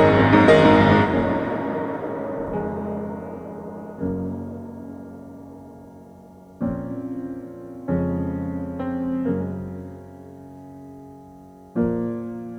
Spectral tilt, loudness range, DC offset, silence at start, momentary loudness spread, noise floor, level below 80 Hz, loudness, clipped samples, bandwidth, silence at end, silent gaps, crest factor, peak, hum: -8 dB/octave; 13 LU; under 0.1%; 0 s; 27 LU; -45 dBFS; -46 dBFS; -22 LUFS; under 0.1%; 9.4 kHz; 0 s; none; 20 dB; -2 dBFS; none